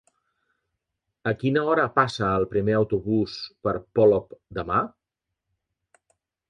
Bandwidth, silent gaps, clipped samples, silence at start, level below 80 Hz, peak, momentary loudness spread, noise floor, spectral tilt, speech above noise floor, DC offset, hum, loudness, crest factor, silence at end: 9.2 kHz; none; under 0.1%; 1.25 s; -52 dBFS; -4 dBFS; 11 LU; -84 dBFS; -7 dB/octave; 61 dB; under 0.1%; none; -24 LUFS; 22 dB; 1.6 s